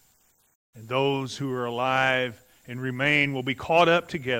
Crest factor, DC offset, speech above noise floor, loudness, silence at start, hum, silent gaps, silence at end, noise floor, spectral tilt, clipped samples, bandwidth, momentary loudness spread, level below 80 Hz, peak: 20 dB; under 0.1%; 40 dB; -24 LUFS; 0.75 s; none; none; 0 s; -64 dBFS; -5 dB/octave; under 0.1%; 16 kHz; 12 LU; -62 dBFS; -6 dBFS